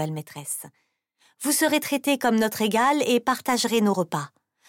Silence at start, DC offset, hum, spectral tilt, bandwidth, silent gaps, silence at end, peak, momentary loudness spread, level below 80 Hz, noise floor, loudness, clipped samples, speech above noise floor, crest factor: 0 s; under 0.1%; none; -3.5 dB/octave; 17 kHz; none; 0.4 s; -10 dBFS; 11 LU; -68 dBFS; -65 dBFS; -23 LUFS; under 0.1%; 41 dB; 14 dB